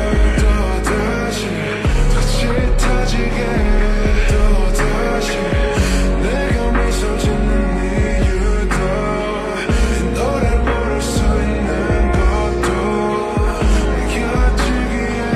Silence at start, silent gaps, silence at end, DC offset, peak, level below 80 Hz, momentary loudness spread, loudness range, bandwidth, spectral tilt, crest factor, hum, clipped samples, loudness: 0 s; none; 0 s; under 0.1%; -2 dBFS; -18 dBFS; 2 LU; 1 LU; 13 kHz; -5.5 dB/octave; 14 dB; none; under 0.1%; -17 LUFS